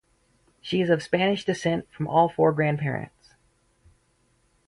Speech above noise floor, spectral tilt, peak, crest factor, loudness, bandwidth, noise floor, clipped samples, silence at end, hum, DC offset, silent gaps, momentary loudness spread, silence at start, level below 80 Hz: 43 dB; -6.5 dB/octave; -6 dBFS; 20 dB; -24 LUFS; 11.5 kHz; -66 dBFS; under 0.1%; 1.6 s; none; under 0.1%; none; 10 LU; 0.65 s; -60 dBFS